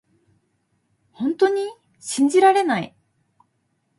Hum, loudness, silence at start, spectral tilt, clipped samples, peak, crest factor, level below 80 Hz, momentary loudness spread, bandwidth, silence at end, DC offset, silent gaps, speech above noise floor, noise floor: none; -20 LUFS; 1.2 s; -4 dB/octave; under 0.1%; -6 dBFS; 18 dB; -72 dBFS; 17 LU; 11.5 kHz; 1.1 s; under 0.1%; none; 51 dB; -70 dBFS